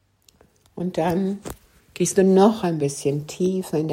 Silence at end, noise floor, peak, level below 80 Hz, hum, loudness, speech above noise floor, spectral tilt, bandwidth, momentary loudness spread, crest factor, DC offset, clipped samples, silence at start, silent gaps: 0 s; -57 dBFS; -2 dBFS; -54 dBFS; none; -21 LUFS; 37 dB; -6 dB/octave; 16 kHz; 15 LU; 20 dB; under 0.1%; under 0.1%; 0.75 s; none